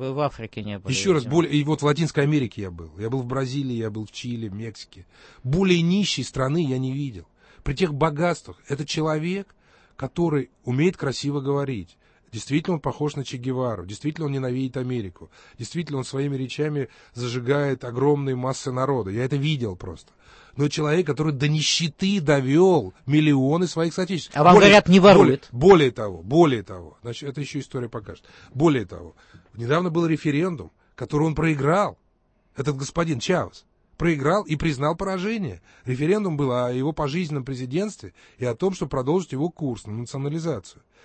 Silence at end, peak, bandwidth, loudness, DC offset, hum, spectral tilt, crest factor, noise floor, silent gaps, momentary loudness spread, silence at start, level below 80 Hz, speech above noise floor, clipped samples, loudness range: 0.35 s; -2 dBFS; 8.8 kHz; -22 LUFS; under 0.1%; none; -6 dB/octave; 20 dB; -64 dBFS; none; 15 LU; 0 s; -48 dBFS; 42 dB; under 0.1%; 12 LU